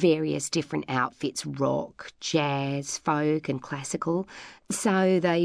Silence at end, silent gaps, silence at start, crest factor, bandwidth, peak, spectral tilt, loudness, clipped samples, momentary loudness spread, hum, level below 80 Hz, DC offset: 0 s; none; 0 s; 16 dB; 11 kHz; -10 dBFS; -5 dB/octave; -27 LUFS; under 0.1%; 10 LU; none; -64 dBFS; under 0.1%